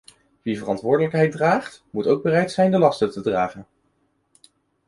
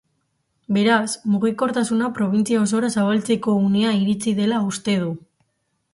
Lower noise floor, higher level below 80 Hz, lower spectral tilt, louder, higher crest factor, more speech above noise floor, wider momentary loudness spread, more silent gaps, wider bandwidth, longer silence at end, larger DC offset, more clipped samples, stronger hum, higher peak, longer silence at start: second, -67 dBFS vs -72 dBFS; about the same, -60 dBFS vs -62 dBFS; first, -7 dB/octave vs -5.5 dB/octave; about the same, -21 LUFS vs -20 LUFS; about the same, 18 dB vs 14 dB; second, 47 dB vs 52 dB; first, 10 LU vs 4 LU; neither; about the same, 11.5 kHz vs 11.5 kHz; first, 1.25 s vs 0.75 s; neither; neither; neither; about the same, -4 dBFS vs -6 dBFS; second, 0.45 s vs 0.7 s